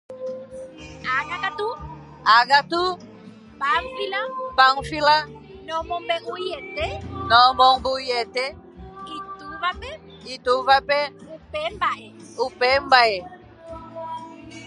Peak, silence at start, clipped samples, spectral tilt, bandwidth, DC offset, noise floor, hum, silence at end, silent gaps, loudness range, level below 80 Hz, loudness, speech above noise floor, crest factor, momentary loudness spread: -2 dBFS; 0.1 s; under 0.1%; -3.5 dB/octave; 11.5 kHz; under 0.1%; -44 dBFS; none; 0 s; none; 4 LU; -48 dBFS; -21 LUFS; 23 dB; 22 dB; 21 LU